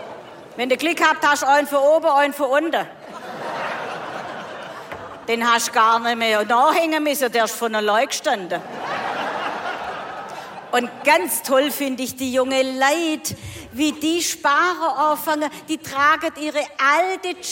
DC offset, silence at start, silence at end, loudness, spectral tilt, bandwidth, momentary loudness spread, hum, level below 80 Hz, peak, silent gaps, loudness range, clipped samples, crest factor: under 0.1%; 0 s; 0 s; -20 LUFS; -2 dB/octave; 17 kHz; 16 LU; none; -62 dBFS; -4 dBFS; none; 5 LU; under 0.1%; 16 dB